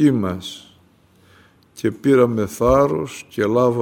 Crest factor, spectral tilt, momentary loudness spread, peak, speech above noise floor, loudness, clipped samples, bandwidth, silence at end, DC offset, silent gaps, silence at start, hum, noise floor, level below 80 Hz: 16 dB; -7 dB/octave; 14 LU; -2 dBFS; 36 dB; -19 LUFS; under 0.1%; 17 kHz; 0 s; under 0.1%; none; 0 s; none; -54 dBFS; -42 dBFS